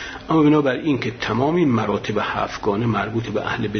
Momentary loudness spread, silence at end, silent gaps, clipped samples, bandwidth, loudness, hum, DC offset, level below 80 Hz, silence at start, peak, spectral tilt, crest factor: 7 LU; 0 s; none; under 0.1%; 6.6 kHz; -20 LUFS; none; under 0.1%; -48 dBFS; 0 s; -6 dBFS; -7 dB/octave; 14 dB